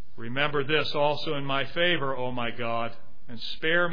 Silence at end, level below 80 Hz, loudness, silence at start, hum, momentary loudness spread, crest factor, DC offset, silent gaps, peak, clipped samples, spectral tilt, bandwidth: 0 s; -56 dBFS; -28 LUFS; 0.15 s; none; 11 LU; 20 dB; 4%; none; -8 dBFS; under 0.1%; -6.5 dB/octave; 5.4 kHz